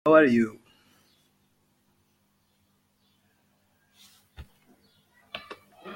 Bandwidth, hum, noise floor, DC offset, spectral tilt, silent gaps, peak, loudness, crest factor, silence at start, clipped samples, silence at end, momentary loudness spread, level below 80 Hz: 16.5 kHz; 50 Hz at -75 dBFS; -70 dBFS; under 0.1%; -6.5 dB/octave; none; -6 dBFS; -23 LUFS; 24 dB; 0.05 s; under 0.1%; 0 s; 32 LU; -62 dBFS